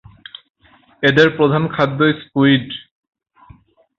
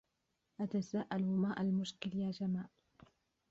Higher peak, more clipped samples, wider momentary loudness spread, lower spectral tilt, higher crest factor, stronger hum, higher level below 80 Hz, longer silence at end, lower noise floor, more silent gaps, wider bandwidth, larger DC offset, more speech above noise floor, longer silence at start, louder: first, 0 dBFS vs -24 dBFS; neither; first, 23 LU vs 7 LU; about the same, -7 dB/octave vs -6.5 dB/octave; about the same, 18 dB vs 16 dB; neither; first, -54 dBFS vs -74 dBFS; first, 1.2 s vs 0.85 s; second, -48 dBFS vs -84 dBFS; neither; about the same, 7.2 kHz vs 7.8 kHz; neither; second, 33 dB vs 47 dB; first, 1 s vs 0.6 s; first, -15 LUFS vs -38 LUFS